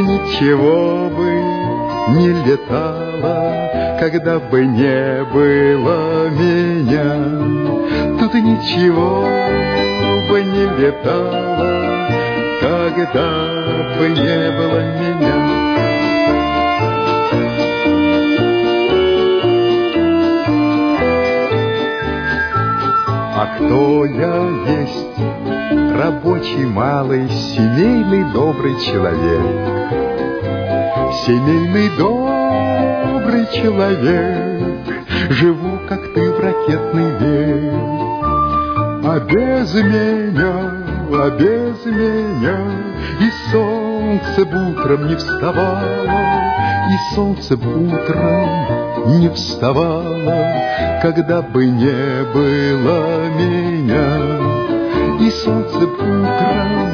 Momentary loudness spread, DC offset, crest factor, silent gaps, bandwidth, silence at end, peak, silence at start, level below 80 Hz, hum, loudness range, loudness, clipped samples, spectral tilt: 5 LU; under 0.1%; 14 dB; none; 5.4 kHz; 0 s; -2 dBFS; 0 s; -36 dBFS; none; 2 LU; -15 LUFS; under 0.1%; -7.5 dB/octave